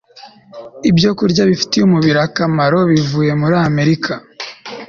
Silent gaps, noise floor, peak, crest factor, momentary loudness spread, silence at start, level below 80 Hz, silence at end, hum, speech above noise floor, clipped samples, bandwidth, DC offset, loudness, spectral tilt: none; -41 dBFS; -2 dBFS; 12 dB; 13 LU; 0.25 s; -48 dBFS; 0.05 s; none; 28 dB; under 0.1%; 7.2 kHz; under 0.1%; -13 LUFS; -6 dB/octave